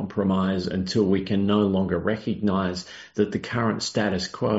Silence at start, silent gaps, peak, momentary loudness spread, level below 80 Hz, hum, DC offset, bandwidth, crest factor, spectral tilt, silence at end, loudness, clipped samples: 0 s; none; -8 dBFS; 5 LU; -56 dBFS; none; under 0.1%; 8 kHz; 16 dB; -5.5 dB/octave; 0 s; -24 LUFS; under 0.1%